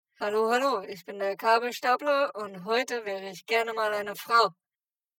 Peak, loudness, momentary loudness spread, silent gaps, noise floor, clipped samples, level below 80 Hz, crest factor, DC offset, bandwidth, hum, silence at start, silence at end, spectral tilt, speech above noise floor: -8 dBFS; -27 LUFS; 9 LU; none; under -90 dBFS; under 0.1%; -82 dBFS; 20 dB; under 0.1%; 17.5 kHz; none; 0.2 s; 0.65 s; -3 dB/octave; over 63 dB